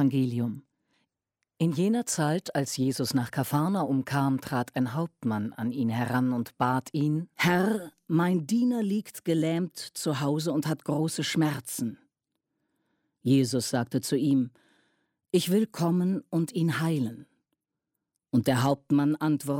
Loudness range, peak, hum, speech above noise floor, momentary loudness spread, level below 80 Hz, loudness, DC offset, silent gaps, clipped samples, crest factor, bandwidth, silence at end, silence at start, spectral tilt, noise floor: 2 LU; -12 dBFS; none; 58 dB; 6 LU; -70 dBFS; -28 LUFS; under 0.1%; none; under 0.1%; 16 dB; 16.5 kHz; 0 s; 0 s; -6 dB/octave; -85 dBFS